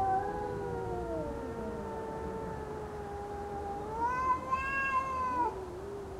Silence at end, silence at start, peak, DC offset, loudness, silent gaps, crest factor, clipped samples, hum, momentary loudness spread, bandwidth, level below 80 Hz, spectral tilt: 0 s; 0 s; -20 dBFS; under 0.1%; -36 LUFS; none; 16 dB; under 0.1%; none; 10 LU; 15 kHz; -50 dBFS; -6.5 dB/octave